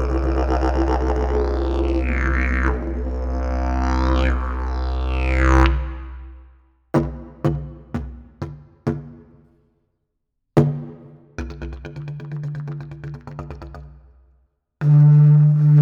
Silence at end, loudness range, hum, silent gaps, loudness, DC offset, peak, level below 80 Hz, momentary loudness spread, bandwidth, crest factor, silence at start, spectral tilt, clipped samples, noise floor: 0 s; 10 LU; none; none; -20 LUFS; under 0.1%; -2 dBFS; -24 dBFS; 21 LU; 7 kHz; 18 dB; 0 s; -8.5 dB/octave; under 0.1%; -74 dBFS